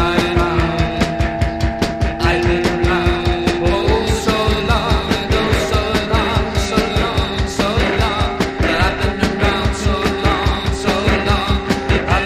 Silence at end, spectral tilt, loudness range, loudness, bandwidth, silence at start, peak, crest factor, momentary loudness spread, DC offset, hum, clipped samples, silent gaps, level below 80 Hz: 0 s; -5.5 dB/octave; 1 LU; -17 LUFS; 15 kHz; 0 s; 0 dBFS; 16 dB; 3 LU; under 0.1%; none; under 0.1%; none; -22 dBFS